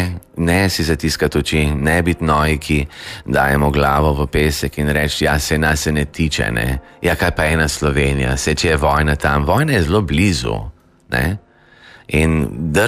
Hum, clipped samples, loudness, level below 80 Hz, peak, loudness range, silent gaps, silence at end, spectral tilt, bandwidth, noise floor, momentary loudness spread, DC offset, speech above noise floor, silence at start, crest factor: none; under 0.1%; -17 LUFS; -26 dBFS; -2 dBFS; 2 LU; none; 0 s; -5 dB/octave; 15.5 kHz; -45 dBFS; 6 LU; under 0.1%; 29 dB; 0 s; 14 dB